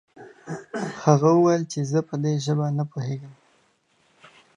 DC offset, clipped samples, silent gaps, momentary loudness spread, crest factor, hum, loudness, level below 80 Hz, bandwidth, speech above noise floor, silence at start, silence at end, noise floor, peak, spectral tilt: under 0.1%; under 0.1%; none; 18 LU; 22 dB; none; -23 LUFS; -70 dBFS; 10 kHz; 43 dB; 0.2 s; 1.25 s; -65 dBFS; -2 dBFS; -7 dB/octave